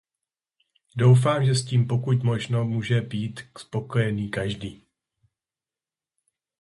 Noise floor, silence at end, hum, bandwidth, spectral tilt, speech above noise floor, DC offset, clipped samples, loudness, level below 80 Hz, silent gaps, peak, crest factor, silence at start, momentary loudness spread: under -90 dBFS; 1.85 s; none; 11.5 kHz; -6.5 dB/octave; over 67 dB; under 0.1%; under 0.1%; -24 LUFS; -56 dBFS; none; -8 dBFS; 18 dB; 0.95 s; 15 LU